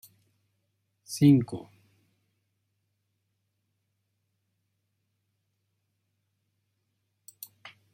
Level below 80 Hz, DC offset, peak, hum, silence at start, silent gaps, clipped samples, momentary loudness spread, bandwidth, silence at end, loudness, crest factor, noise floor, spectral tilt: -72 dBFS; under 0.1%; -10 dBFS; none; 1.1 s; none; under 0.1%; 25 LU; 16 kHz; 6.35 s; -23 LUFS; 24 dB; -79 dBFS; -7 dB/octave